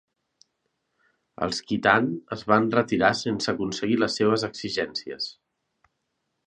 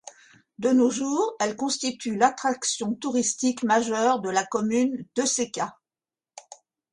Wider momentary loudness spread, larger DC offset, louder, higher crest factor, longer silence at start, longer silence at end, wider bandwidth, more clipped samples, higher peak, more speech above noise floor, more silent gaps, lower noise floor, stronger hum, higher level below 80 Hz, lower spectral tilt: first, 11 LU vs 7 LU; neither; about the same, -25 LUFS vs -25 LUFS; about the same, 24 dB vs 20 dB; first, 1.4 s vs 0.05 s; first, 1.15 s vs 0.4 s; about the same, 10 kHz vs 11 kHz; neither; first, -2 dBFS vs -6 dBFS; second, 54 dB vs over 66 dB; neither; second, -78 dBFS vs under -90 dBFS; neither; first, -60 dBFS vs -70 dBFS; first, -4.5 dB/octave vs -3 dB/octave